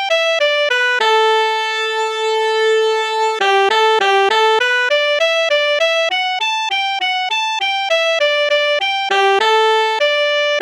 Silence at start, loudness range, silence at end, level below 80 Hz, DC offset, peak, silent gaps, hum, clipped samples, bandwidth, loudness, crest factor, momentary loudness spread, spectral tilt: 0 s; 2 LU; 0 s; -84 dBFS; under 0.1%; -2 dBFS; none; none; under 0.1%; 13.5 kHz; -14 LUFS; 14 dB; 4 LU; 1 dB/octave